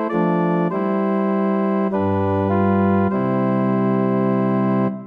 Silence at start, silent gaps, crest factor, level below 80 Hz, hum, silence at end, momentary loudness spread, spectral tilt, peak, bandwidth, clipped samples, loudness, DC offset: 0 s; none; 12 dB; -64 dBFS; none; 0 s; 2 LU; -11 dB/octave; -6 dBFS; 4 kHz; under 0.1%; -19 LUFS; under 0.1%